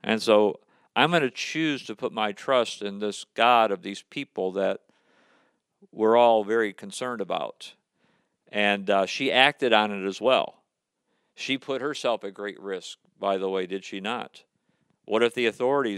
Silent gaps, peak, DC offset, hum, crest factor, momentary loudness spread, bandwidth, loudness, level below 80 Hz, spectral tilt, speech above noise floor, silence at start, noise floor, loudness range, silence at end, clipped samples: none; -2 dBFS; under 0.1%; none; 24 dB; 15 LU; 13 kHz; -25 LUFS; -84 dBFS; -4 dB/octave; 53 dB; 0.05 s; -78 dBFS; 6 LU; 0 s; under 0.1%